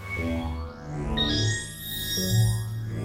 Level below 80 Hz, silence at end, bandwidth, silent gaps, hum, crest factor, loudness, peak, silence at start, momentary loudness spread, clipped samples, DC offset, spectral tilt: -38 dBFS; 0 s; 16 kHz; none; none; 14 dB; -27 LUFS; -12 dBFS; 0 s; 11 LU; under 0.1%; under 0.1%; -4.5 dB/octave